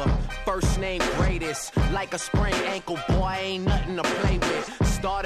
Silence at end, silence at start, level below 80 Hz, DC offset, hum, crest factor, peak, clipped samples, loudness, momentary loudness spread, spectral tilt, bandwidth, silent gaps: 0 s; 0 s; -30 dBFS; under 0.1%; none; 14 dB; -10 dBFS; under 0.1%; -26 LUFS; 4 LU; -5 dB/octave; 14 kHz; none